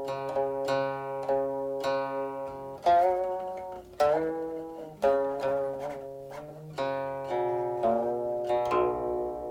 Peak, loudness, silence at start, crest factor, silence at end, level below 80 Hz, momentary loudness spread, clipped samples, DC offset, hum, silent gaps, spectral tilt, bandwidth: -12 dBFS; -30 LUFS; 0 s; 18 dB; 0 s; -60 dBFS; 13 LU; under 0.1%; under 0.1%; none; none; -6 dB/octave; 16 kHz